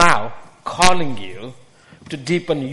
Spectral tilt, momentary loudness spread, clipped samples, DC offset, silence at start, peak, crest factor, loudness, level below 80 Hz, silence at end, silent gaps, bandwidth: -3.5 dB/octave; 18 LU; under 0.1%; under 0.1%; 0 s; 0 dBFS; 18 dB; -19 LUFS; -40 dBFS; 0 s; none; over 20 kHz